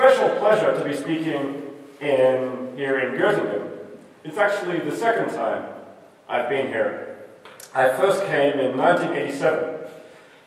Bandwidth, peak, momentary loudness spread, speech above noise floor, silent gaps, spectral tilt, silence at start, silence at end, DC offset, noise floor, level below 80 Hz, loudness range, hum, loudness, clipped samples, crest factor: 14.5 kHz; -2 dBFS; 18 LU; 24 dB; none; -5.5 dB/octave; 0 s; 0.4 s; under 0.1%; -46 dBFS; -76 dBFS; 3 LU; none; -22 LUFS; under 0.1%; 20 dB